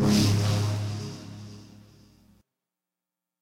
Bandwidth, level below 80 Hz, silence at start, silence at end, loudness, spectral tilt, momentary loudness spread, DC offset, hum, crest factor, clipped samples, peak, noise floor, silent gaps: 16 kHz; -52 dBFS; 0 s; 1.8 s; -26 LUFS; -5.5 dB/octave; 23 LU; under 0.1%; none; 16 dB; under 0.1%; -12 dBFS; -89 dBFS; none